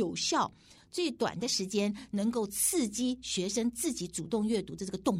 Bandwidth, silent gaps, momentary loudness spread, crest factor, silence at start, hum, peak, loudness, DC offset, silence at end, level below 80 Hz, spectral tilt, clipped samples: 16 kHz; none; 6 LU; 16 dB; 0 s; none; -16 dBFS; -32 LUFS; under 0.1%; 0 s; -62 dBFS; -3.5 dB/octave; under 0.1%